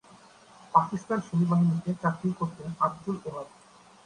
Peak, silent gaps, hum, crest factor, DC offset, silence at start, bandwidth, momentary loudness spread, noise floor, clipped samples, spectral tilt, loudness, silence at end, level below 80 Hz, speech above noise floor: -6 dBFS; none; none; 22 dB; under 0.1%; 0.75 s; 10 kHz; 11 LU; -54 dBFS; under 0.1%; -8.5 dB/octave; -28 LUFS; 0.55 s; -66 dBFS; 27 dB